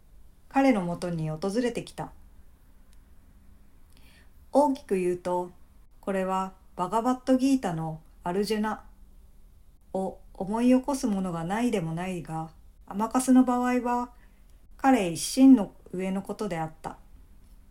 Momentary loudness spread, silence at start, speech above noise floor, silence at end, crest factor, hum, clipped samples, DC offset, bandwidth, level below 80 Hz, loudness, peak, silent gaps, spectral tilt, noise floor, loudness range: 15 LU; 0.15 s; 27 dB; 0.75 s; 20 dB; none; under 0.1%; under 0.1%; 15.5 kHz; -52 dBFS; -27 LUFS; -8 dBFS; none; -6 dB/octave; -53 dBFS; 8 LU